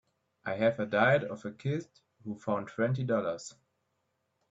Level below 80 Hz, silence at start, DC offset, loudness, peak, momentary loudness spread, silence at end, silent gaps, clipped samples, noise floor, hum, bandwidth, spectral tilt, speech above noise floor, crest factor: -72 dBFS; 0.45 s; under 0.1%; -31 LUFS; -12 dBFS; 16 LU; 1 s; none; under 0.1%; -79 dBFS; none; 8 kHz; -6.5 dB/octave; 48 dB; 20 dB